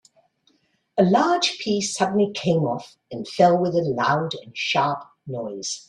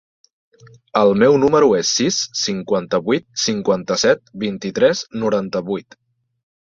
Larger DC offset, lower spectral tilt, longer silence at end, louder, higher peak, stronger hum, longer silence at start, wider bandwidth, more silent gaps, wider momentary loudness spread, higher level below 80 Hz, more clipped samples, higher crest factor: neither; about the same, -4.5 dB/octave vs -4 dB/octave; second, 0.05 s vs 0.95 s; second, -22 LUFS vs -18 LUFS; about the same, -4 dBFS vs -2 dBFS; neither; about the same, 0.95 s vs 0.95 s; first, 11 kHz vs 7.8 kHz; neither; first, 14 LU vs 10 LU; second, -64 dBFS vs -56 dBFS; neither; about the same, 18 dB vs 16 dB